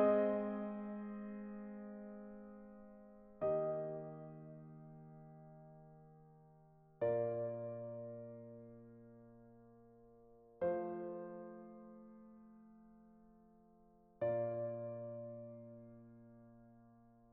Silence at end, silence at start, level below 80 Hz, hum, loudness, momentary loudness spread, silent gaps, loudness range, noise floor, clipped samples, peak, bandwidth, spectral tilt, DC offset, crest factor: 0 s; 0 s; -76 dBFS; none; -43 LUFS; 25 LU; none; 5 LU; -68 dBFS; under 0.1%; -22 dBFS; 3.8 kHz; -8.5 dB/octave; under 0.1%; 22 dB